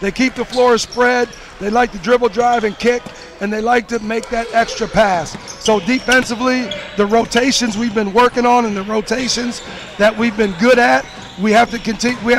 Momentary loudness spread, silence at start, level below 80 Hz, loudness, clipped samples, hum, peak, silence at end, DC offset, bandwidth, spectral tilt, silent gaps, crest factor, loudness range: 8 LU; 0 s; -40 dBFS; -15 LUFS; under 0.1%; none; -4 dBFS; 0 s; under 0.1%; 15.5 kHz; -3.5 dB/octave; none; 12 dB; 2 LU